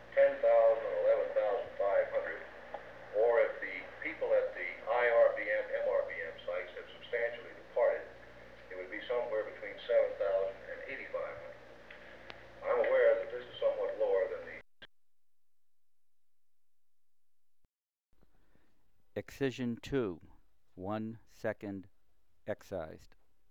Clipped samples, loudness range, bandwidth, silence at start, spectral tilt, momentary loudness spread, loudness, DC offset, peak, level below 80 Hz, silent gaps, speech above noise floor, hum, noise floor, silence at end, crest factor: under 0.1%; 9 LU; 7.6 kHz; 0 s; -6 dB/octave; 20 LU; -34 LUFS; 0.1%; -16 dBFS; -68 dBFS; none; over 51 dB; none; under -90 dBFS; 0.55 s; 18 dB